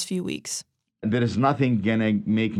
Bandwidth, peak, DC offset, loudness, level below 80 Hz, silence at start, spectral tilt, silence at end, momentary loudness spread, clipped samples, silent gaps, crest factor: 13.5 kHz; -8 dBFS; under 0.1%; -24 LUFS; -62 dBFS; 0 s; -5.5 dB/octave; 0 s; 10 LU; under 0.1%; none; 16 dB